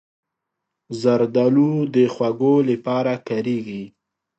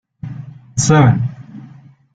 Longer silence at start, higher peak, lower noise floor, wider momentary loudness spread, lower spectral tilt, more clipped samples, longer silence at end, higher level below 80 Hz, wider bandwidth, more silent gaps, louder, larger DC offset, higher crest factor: first, 0.9 s vs 0.25 s; about the same, -4 dBFS vs -2 dBFS; first, -81 dBFS vs -41 dBFS; second, 14 LU vs 25 LU; first, -8 dB/octave vs -5.5 dB/octave; neither; about the same, 0.5 s vs 0.5 s; second, -68 dBFS vs -44 dBFS; second, 8.2 kHz vs 9.4 kHz; neither; second, -19 LUFS vs -14 LUFS; neither; about the same, 16 dB vs 16 dB